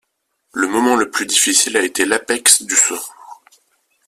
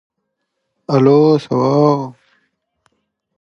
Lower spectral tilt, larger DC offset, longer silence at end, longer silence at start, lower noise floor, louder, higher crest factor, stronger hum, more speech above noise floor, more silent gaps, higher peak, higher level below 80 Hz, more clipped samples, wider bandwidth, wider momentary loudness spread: second, 0 dB/octave vs -8.5 dB/octave; neither; second, 0.75 s vs 1.3 s; second, 0.55 s vs 0.9 s; second, -69 dBFS vs -73 dBFS; about the same, -14 LUFS vs -13 LUFS; about the same, 18 dB vs 16 dB; neither; second, 53 dB vs 61 dB; neither; about the same, 0 dBFS vs 0 dBFS; about the same, -60 dBFS vs -62 dBFS; neither; first, 16 kHz vs 7 kHz; second, 11 LU vs 15 LU